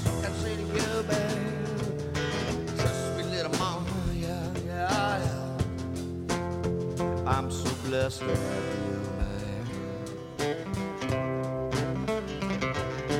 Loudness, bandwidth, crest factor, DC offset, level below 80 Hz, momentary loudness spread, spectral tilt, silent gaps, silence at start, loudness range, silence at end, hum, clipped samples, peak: -31 LUFS; 16 kHz; 18 dB; under 0.1%; -44 dBFS; 5 LU; -5.5 dB/octave; none; 0 s; 2 LU; 0 s; none; under 0.1%; -12 dBFS